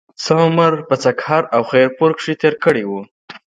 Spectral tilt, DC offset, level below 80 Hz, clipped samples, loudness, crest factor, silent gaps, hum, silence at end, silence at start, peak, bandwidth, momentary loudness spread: -6 dB/octave; under 0.1%; -60 dBFS; under 0.1%; -15 LUFS; 16 dB; 3.11-3.28 s; none; 0.15 s; 0.2 s; 0 dBFS; 9.2 kHz; 7 LU